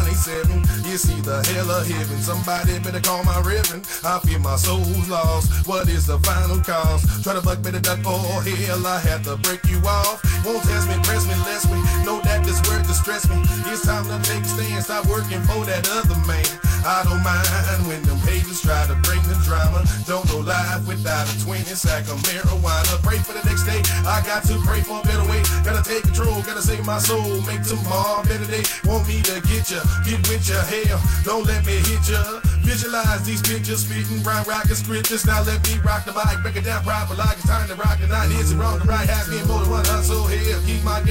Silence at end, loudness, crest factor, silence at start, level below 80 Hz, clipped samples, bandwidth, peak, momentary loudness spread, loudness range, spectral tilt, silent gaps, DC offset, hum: 0 s; -20 LUFS; 14 dB; 0 s; -24 dBFS; under 0.1%; 16.5 kHz; -6 dBFS; 3 LU; 1 LU; -4.5 dB/octave; none; 0.4%; none